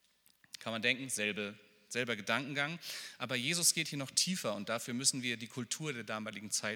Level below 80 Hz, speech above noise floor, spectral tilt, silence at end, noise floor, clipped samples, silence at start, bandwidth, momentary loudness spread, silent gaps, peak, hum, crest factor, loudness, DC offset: -88 dBFS; 33 dB; -2 dB/octave; 0 s; -69 dBFS; under 0.1%; 0.55 s; 19 kHz; 12 LU; none; -14 dBFS; none; 24 dB; -35 LUFS; under 0.1%